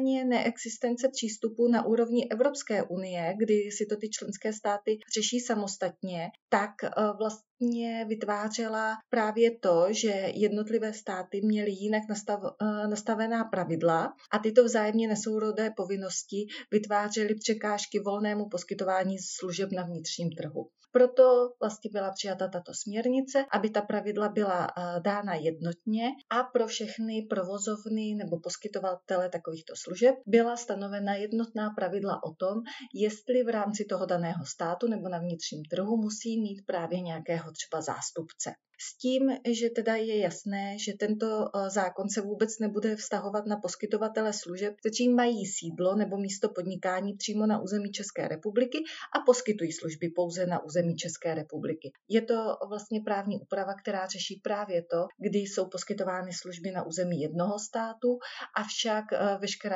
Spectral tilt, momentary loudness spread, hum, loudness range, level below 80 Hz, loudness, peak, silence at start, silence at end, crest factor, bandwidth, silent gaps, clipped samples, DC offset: -4.5 dB/octave; 9 LU; none; 5 LU; under -90 dBFS; -30 LUFS; -8 dBFS; 0 s; 0 s; 22 dB; 8 kHz; 6.42-6.48 s, 7.50-7.57 s; under 0.1%; under 0.1%